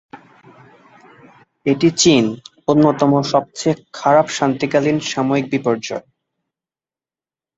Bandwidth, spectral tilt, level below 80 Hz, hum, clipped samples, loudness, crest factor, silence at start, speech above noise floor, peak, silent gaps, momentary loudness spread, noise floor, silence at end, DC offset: 8.2 kHz; -5 dB/octave; -56 dBFS; none; under 0.1%; -17 LUFS; 18 dB; 0.15 s; over 74 dB; -2 dBFS; none; 10 LU; under -90 dBFS; 1.55 s; under 0.1%